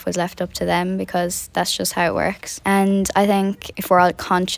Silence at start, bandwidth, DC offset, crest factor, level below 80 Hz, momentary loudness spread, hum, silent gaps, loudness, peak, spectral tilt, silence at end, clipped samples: 0 s; 16 kHz; under 0.1%; 18 dB; -46 dBFS; 8 LU; none; none; -20 LUFS; -2 dBFS; -4.5 dB/octave; 0 s; under 0.1%